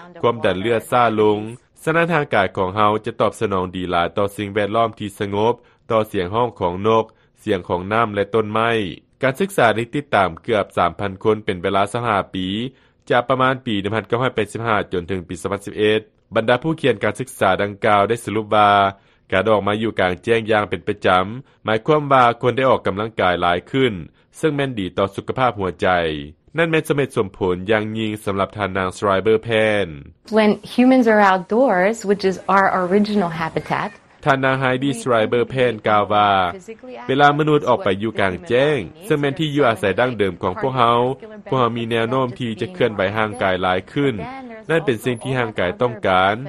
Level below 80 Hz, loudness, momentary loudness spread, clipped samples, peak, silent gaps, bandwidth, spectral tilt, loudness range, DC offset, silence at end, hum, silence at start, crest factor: -52 dBFS; -19 LUFS; 8 LU; under 0.1%; 0 dBFS; none; 13 kHz; -6 dB/octave; 4 LU; under 0.1%; 0 s; none; 0 s; 18 dB